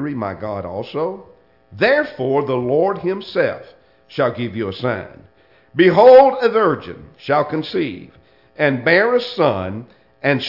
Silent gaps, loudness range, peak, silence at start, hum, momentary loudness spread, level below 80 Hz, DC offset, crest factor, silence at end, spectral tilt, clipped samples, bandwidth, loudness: none; 6 LU; 0 dBFS; 0 s; none; 16 LU; -60 dBFS; under 0.1%; 18 dB; 0 s; -7.5 dB/octave; under 0.1%; 5.8 kHz; -17 LUFS